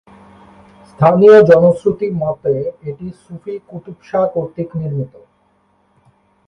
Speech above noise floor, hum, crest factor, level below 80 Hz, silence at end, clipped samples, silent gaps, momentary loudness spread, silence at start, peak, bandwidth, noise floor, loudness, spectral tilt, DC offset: 44 dB; none; 16 dB; -52 dBFS; 1.4 s; under 0.1%; none; 23 LU; 1 s; 0 dBFS; 6.4 kHz; -58 dBFS; -13 LUFS; -9 dB/octave; under 0.1%